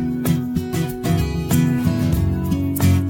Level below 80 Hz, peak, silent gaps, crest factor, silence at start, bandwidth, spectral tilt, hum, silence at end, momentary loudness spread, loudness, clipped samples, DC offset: -32 dBFS; -4 dBFS; none; 14 dB; 0 s; 17 kHz; -6.5 dB/octave; none; 0 s; 5 LU; -20 LUFS; under 0.1%; under 0.1%